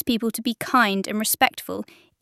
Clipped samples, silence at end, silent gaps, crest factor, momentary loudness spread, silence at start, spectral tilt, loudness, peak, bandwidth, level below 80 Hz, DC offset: under 0.1%; 0.4 s; none; 22 dB; 14 LU; 0.05 s; -3 dB/octave; -22 LUFS; -2 dBFS; 16 kHz; -58 dBFS; under 0.1%